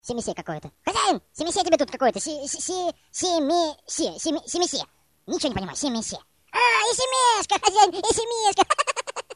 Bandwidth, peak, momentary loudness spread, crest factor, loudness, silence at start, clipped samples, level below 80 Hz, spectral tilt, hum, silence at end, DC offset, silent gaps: 11.5 kHz; -4 dBFS; 11 LU; 20 dB; -23 LUFS; 0.05 s; under 0.1%; -54 dBFS; -2 dB/octave; none; 0 s; under 0.1%; none